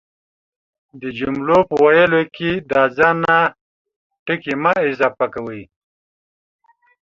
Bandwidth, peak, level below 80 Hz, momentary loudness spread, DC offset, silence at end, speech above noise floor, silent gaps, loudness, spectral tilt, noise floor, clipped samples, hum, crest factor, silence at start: 7.4 kHz; -2 dBFS; -54 dBFS; 16 LU; under 0.1%; 1.55 s; over 74 dB; 3.61-3.85 s, 3.96-4.10 s, 4.19-4.26 s; -16 LUFS; -7 dB/octave; under -90 dBFS; under 0.1%; none; 18 dB; 0.95 s